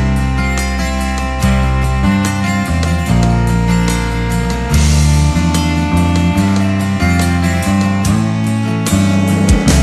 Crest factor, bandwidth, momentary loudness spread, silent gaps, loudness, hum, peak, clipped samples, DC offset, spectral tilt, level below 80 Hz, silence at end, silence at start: 12 dB; 13.5 kHz; 5 LU; none; -14 LUFS; none; 0 dBFS; under 0.1%; under 0.1%; -5.5 dB/octave; -18 dBFS; 0 s; 0 s